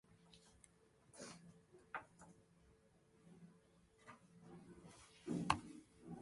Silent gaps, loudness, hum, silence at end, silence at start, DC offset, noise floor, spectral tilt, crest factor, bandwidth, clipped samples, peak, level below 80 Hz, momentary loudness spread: none; -48 LUFS; none; 0 s; 0.05 s; under 0.1%; -73 dBFS; -4.5 dB/octave; 36 dB; 11.5 kHz; under 0.1%; -16 dBFS; -72 dBFS; 25 LU